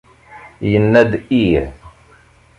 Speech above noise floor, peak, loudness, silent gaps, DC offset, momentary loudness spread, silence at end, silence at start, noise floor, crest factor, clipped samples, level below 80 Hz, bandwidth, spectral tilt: 35 dB; -2 dBFS; -15 LUFS; none; under 0.1%; 11 LU; 0.7 s; 0.3 s; -48 dBFS; 16 dB; under 0.1%; -36 dBFS; 10.5 kHz; -8 dB/octave